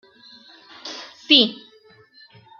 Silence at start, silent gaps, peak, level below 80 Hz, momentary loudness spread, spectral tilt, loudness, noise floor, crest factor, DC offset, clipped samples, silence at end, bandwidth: 0.85 s; none; 0 dBFS; -76 dBFS; 22 LU; -3 dB/octave; -15 LUFS; -52 dBFS; 24 dB; under 0.1%; under 0.1%; 1.05 s; 7.2 kHz